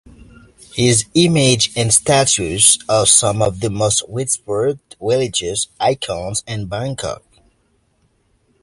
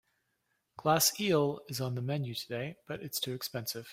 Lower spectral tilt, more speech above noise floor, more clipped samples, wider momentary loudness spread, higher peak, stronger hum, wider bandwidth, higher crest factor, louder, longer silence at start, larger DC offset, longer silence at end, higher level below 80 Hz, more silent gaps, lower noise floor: about the same, -3 dB/octave vs -4 dB/octave; about the same, 45 dB vs 47 dB; neither; about the same, 13 LU vs 12 LU; first, 0 dBFS vs -12 dBFS; neither; second, 12 kHz vs 16.5 kHz; about the same, 18 dB vs 22 dB; first, -15 LUFS vs -32 LUFS; about the same, 0.75 s vs 0.8 s; neither; first, 1.45 s vs 0 s; first, -44 dBFS vs -70 dBFS; neither; second, -61 dBFS vs -80 dBFS